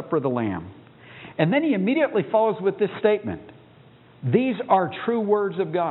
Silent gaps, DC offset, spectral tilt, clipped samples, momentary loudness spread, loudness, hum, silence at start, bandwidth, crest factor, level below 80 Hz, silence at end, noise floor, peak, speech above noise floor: none; under 0.1%; -11.5 dB/octave; under 0.1%; 13 LU; -23 LUFS; none; 0 s; 4.1 kHz; 20 dB; -64 dBFS; 0 s; -51 dBFS; -4 dBFS; 29 dB